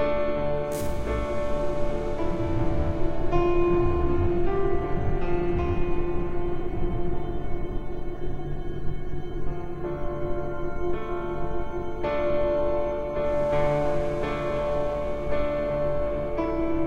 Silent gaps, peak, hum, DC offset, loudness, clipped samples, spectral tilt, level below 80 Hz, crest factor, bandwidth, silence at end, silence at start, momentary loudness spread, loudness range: none; -10 dBFS; none; under 0.1%; -28 LUFS; under 0.1%; -8 dB/octave; -32 dBFS; 12 dB; 9.2 kHz; 0 s; 0 s; 10 LU; 7 LU